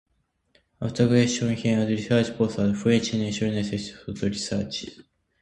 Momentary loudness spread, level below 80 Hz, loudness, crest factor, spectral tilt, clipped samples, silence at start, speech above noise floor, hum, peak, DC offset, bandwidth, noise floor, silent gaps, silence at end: 11 LU; -52 dBFS; -25 LUFS; 18 dB; -5.5 dB/octave; under 0.1%; 0.8 s; 43 dB; none; -8 dBFS; under 0.1%; 11 kHz; -67 dBFS; none; 0.45 s